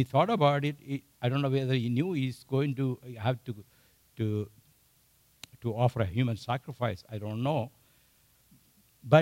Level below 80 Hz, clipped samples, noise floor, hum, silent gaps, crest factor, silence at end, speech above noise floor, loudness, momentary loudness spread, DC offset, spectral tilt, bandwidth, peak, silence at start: -64 dBFS; under 0.1%; -66 dBFS; none; none; 22 dB; 0 s; 36 dB; -31 LUFS; 13 LU; under 0.1%; -7.5 dB/octave; 16 kHz; -8 dBFS; 0 s